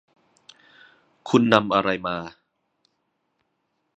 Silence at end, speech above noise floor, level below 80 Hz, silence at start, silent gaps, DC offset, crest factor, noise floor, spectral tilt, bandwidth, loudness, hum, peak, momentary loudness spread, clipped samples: 1.7 s; 54 dB; -62 dBFS; 1.25 s; none; under 0.1%; 26 dB; -74 dBFS; -6 dB/octave; 8.2 kHz; -21 LUFS; none; 0 dBFS; 21 LU; under 0.1%